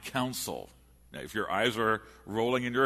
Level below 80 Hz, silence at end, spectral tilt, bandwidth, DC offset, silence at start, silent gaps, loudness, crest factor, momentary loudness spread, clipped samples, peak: -60 dBFS; 0 s; -4 dB/octave; 13.5 kHz; under 0.1%; 0 s; none; -31 LUFS; 18 dB; 16 LU; under 0.1%; -12 dBFS